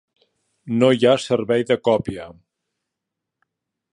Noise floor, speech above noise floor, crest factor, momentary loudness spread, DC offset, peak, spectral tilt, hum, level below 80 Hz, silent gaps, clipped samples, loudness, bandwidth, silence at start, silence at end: -83 dBFS; 64 dB; 20 dB; 12 LU; under 0.1%; -2 dBFS; -6 dB/octave; none; -58 dBFS; none; under 0.1%; -19 LUFS; 11 kHz; 0.65 s; 1.65 s